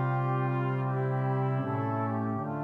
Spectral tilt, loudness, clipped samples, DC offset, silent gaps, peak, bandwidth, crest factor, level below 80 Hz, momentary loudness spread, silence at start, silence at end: -10.5 dB/octave; -30 LUFS; under 0.1%; under 0.1%; none; -18 dBFS; 3.7 kHz; 10 dB; -72 dBFS; 2 LU; 0 s; 0 s